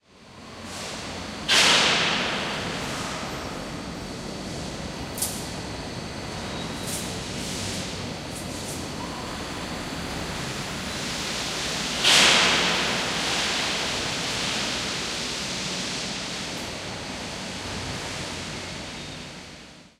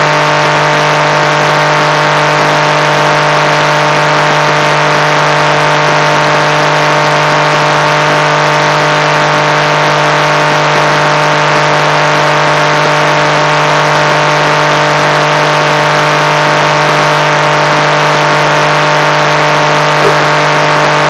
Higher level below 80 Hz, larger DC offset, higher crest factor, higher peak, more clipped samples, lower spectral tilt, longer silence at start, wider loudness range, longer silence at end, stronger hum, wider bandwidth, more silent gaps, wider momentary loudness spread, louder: about the same, -48 dBFS vs -48 dBFS; second, under 0.1% vs 0.1%; first, 24 dB vs 8 dB; second, -4 dBFS vs 0 dBFS; second, under 0.1% vs 0.5%; second, -2 dB/octave vs -4 dB/octave; first, 0.15 s vs 0 s; first, 11 LU vs 0 LU; about the same, 0.1 s vs 0 s; second, none vs 50 Hz at -20 dBFS; first, 16 kHz vs 13.5 kHz; neither; first, 16 LU vs 0 LU; second, -25 LUFS vs -8 LUFS